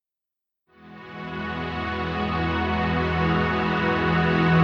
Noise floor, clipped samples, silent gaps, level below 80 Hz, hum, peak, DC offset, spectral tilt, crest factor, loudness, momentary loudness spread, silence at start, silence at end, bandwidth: -87 dBFS; under 0.1%; none; -40 dBFS; none; -8 dBFS; under 0.1%; -8 dB/octave; 16 dB; -24 LUFS; 12 LU; 0.8 s; 0 s; 6.6 kHz